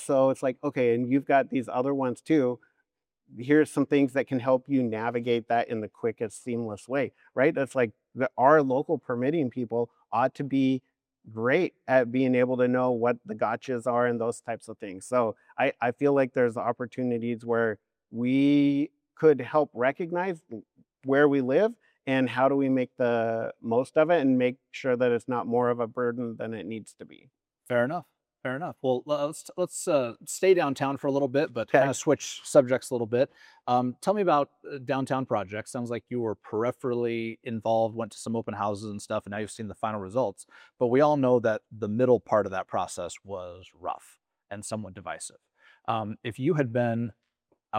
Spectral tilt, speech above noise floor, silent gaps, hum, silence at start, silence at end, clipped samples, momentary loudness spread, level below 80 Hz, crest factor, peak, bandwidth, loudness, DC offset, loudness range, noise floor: -6 dB/octave; 52 dB; none; none; 0 s; 0 s; under 0.1%; 13 LU; -76 dBFS; 22 dB; -6 dBFS; 14.5 kHz; -27 LUFS; under 0.1%; 5 LU; -79 dBFS